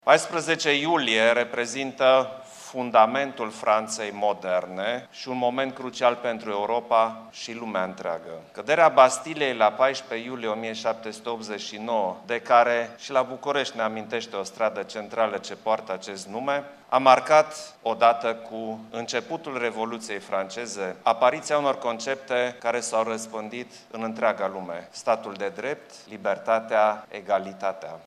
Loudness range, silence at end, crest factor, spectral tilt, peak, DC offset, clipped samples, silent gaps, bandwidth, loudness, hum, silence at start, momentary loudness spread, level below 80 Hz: 5 LU; 0.05 s; 24 dB; -3 dB/octave; -2 dBFS; under 0.1%; under 0.1%; none; 12.5 kHz; -25 LUFS; none; 0.05 s; 13 LU; -78 dBFS